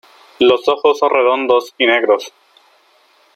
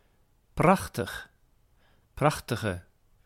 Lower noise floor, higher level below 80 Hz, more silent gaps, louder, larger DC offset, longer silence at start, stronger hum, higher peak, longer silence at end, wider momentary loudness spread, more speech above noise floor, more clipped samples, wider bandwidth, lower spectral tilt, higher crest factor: second, -53 dBFS vs -65 dBFS; second, -62 dBFS vs -52 dBFS; neither; first, -14 LUFS vs -28 LUFS; neither; second, 0.4 s vs 0.55 s; neither; first, 0 dBFS vs -8 dBFS; first, 1.05 s vs 0.45 s; second, 4 LU vs 17 LU; about the same, 40 dB vs 38 dB; neither; second, 13.5 kHz vs 16.5 kHz; second, -3.5 dB/octave vs -6 dB/octave; second, 14 dB vs 22 dB